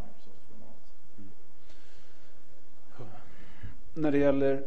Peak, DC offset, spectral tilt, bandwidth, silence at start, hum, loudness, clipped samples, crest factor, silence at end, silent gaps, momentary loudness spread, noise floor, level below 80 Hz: -12 dBFS; 5%; -8.5 dB/octave; 8.6 kHz; 0 s; none; -28 LUFS; under 0.1%; 20 dB; 0 s; none; 27 LU; -60 dBFS; -56 dBFS